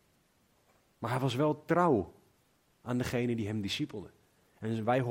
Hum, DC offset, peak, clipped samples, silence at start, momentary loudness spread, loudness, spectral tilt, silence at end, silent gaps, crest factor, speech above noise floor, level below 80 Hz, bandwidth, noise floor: none; under 0.1%; -14 dBFS; under 0.1%; 1 s; 16 LU; -32 LUFS; -6.5 dB/octave; 0 s; none; 20 dB; 39 dB; -66 dBFS; 16 kHz; -70 dBFS